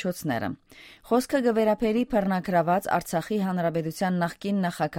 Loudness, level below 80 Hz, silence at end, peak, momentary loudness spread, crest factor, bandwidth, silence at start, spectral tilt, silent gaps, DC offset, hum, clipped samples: -26 LUFS; -54 dBFS; 0 s; -8 dBFS; 6 LU; 16 dB; 17 kHz; 0 s; -6.5 dB/octave; none; under 0.1%; none; under 0.1%